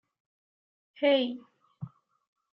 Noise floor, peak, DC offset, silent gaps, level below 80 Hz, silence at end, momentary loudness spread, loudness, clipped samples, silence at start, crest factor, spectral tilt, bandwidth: -46 dBFS; -14 dBFS; under 0.1%; none; -84 dBFS; 0.65 s; 20 LU; -28 LUFS; under 0.1%; 1 s; 20 dB; -3 dB/octave; 5.6 kHz